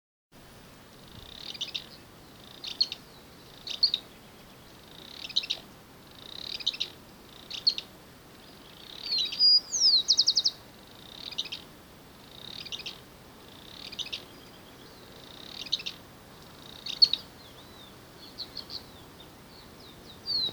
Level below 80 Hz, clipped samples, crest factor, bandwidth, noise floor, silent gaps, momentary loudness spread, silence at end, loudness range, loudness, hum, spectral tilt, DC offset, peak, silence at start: -64 dBFS; under 0.1%; 26 dB; over 20 kHz; -52 dBFS; none; 28 LU; 0 s; 16 LU; -27 LUFS; none; -0.5 dB/octave; under 0.1%; -8 dBFS; 0.35 s